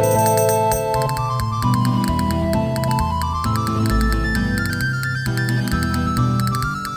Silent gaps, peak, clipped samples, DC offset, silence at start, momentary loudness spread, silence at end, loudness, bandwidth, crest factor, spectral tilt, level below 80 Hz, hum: none; -4 dBFS; under 0.1%; under 0.1%; 0 s; 5 LU; 0 s; -19 LUFS; over 20 kHz; 14 dB; -5.5 dB/octave; -28 dBFS; none